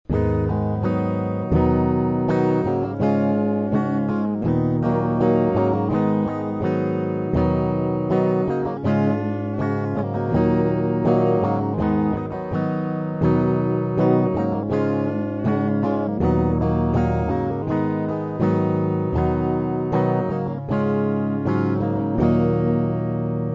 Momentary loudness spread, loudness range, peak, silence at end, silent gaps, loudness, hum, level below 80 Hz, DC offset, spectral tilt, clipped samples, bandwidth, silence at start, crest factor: 5 LU; 1 LU; -6 dBFS; 0 s; none; -21 LUFS; none; -38 dBFS; under 0.1%; -10.5 dB/octave; under 0.1%; 7.4 kHz; 0.1 s; 16 dB